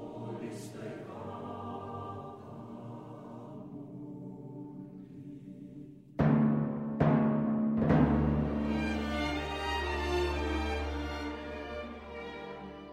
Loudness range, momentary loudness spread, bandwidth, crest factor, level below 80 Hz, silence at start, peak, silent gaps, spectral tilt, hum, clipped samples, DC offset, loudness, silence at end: 17 LU; 19 LU; 11.5 kHz; 20 dB; -44 dBFS; 0 s; -14 dBFS; none; -7.5 dB/octave; none; under 0.1%; under 0.1%; -33 LUFS; 0 s